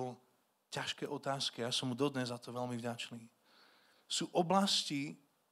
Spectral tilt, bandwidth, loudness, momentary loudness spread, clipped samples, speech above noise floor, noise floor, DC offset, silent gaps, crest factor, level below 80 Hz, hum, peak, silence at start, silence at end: -4 dB/octave; 15.5 kHz; -37 LUFS; 14 LU; under 0.1%; 37 dB; -75 dBFS; under 0.1%; none; 22 dB; -86 dBFS; none; -16 dBFS; 0 s; 0.35 s